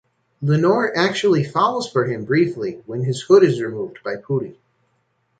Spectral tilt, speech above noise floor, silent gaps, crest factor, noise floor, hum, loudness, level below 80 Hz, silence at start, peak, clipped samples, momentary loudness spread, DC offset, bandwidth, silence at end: -6.5 dB/octave; 48 dB; none; 18 dB; -67 dBFS; none; -19 LUFS; -62 dBFS; 0.4 s; -2 dBFS; under 0.1%; 13 LU; under 0.1%; 9.2 kHz; 0.85 s